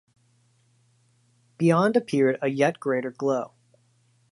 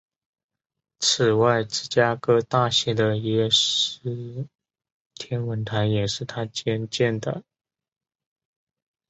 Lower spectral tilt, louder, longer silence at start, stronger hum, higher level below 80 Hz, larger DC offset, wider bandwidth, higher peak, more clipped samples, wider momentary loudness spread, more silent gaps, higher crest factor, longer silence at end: first, -7 dB/octave vs -4 dB/octave; about the same, -24 LUFS vs -23 LUFS; first, 1.6 s vs 1 s; neither; second, -76 dBFS vs -58 dBFS; neither; first, 11.5 kHz vs 8.2 kHz; second, -8 dBFS vs -4 dBFS; neither; second, 7 LU vs 13 LU; second, none vs 4.92-5.10 s; about the same, 20 dB vs 20 dB; second, 0.85 s vs 1.7 s